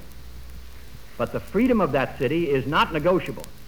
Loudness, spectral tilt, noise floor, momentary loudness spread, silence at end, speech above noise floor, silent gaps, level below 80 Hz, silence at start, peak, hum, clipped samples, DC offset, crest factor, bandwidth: -23 LUFS; -6.5 dB/octave; -43 dBFS; 23 LU; 0 s; 20 dB; none; -44 dBFS; 0 s; -8 dBFS; none; under 0.1%; 1%; 16 dB; over 20 kHz